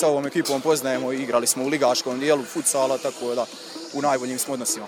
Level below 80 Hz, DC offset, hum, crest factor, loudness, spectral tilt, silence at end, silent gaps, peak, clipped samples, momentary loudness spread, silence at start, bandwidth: -72 dBFS; under 0.1%; none; 16 dB; -23 LUFS; -3 dB/octave; 0 s; none; -6 dBFS; under 0.1%; 6 LU; 0 s; 19 kHz